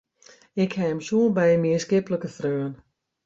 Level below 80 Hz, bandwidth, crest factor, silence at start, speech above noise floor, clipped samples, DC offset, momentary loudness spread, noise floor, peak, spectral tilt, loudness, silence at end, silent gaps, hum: -64 dBFS; 8 kHz; 14 dB; 0.55 s; 32 dB; under 0.1%; under 0.1%; 10 LU; -55 dBFS; -10 dBFS; -6.5 dB/octave; -24 LUFS; 0.5 s; none; none